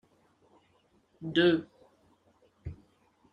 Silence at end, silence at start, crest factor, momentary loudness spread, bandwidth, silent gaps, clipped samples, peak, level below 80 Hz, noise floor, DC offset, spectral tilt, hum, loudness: 0.6 s; 1.2 s; 24 dB; 22 LU; 6.8 kHz; none; under 0.1%; -10 dBFS; -62 dBFS; -68 dBFS; under 0.1%; -7 dB/octave; none; -28 LUFS